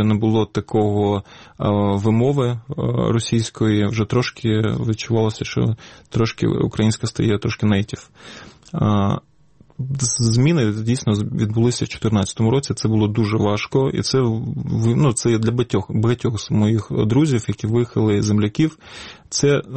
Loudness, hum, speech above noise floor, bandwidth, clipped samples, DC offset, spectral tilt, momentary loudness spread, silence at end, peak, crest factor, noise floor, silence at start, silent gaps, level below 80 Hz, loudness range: -19 LUFS; none; 34 dB; 8.8 kHz; under 0.1%; 0.2%; -6 dB/octave; 7 LU; 0 s; -6 dBFS; 12 dB; -53 dBFS; 0 s; none; -46 dBFS; 2 LU